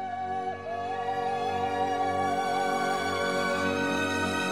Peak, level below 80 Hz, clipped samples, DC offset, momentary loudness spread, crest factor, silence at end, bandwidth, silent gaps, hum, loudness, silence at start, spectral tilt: -14 dBFS; -66 dBFS; under 0.1%; 0.2%; 5 LU; 14 dB; 0 s; 16 kHz; none; none; -29 LUFS; 0 s; -4 dB/octave